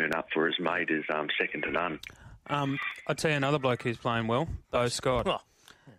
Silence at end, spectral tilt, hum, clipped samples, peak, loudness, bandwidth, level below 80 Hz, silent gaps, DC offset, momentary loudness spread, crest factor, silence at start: 0.05 s; -5 dB/octave; none; under 0.1%; -14 dBFS; -30 LUFS; 15.5 kHz; -54 dBFS; none; under 0.1%; 6 LU; 18 dB; 0 s